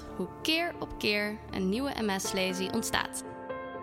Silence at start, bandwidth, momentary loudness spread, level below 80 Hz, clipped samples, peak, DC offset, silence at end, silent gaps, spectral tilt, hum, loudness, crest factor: 0 s; 16.5 kHz; 10 LU; -54 dBFS; under 0.1%; -10 dBFS; under 0.1%; 0 s; none; -3.5 dB/octave; none; -31 LUFS; 22 dB